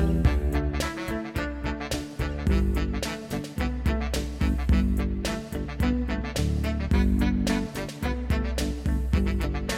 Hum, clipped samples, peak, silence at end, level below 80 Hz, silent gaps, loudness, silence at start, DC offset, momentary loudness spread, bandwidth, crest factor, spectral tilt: none; under 0.1%; -8 dBFS; 0 s; -28 dBFS; none; -28 LUFS; 0 s; under 0.1%; 7 LU; 15.5 kHz; 16 dB; -6 dB/octave